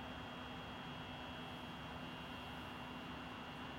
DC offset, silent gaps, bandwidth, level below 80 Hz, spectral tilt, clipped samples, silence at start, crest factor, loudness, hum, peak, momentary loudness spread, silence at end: under 0.1%; none; 16 kHz; -64 dBFS; -5 dB/octave; under 0.1%; 0 s; 12 dB; -49 LUFS; none; -36 dBFS; 0 LU; 0 s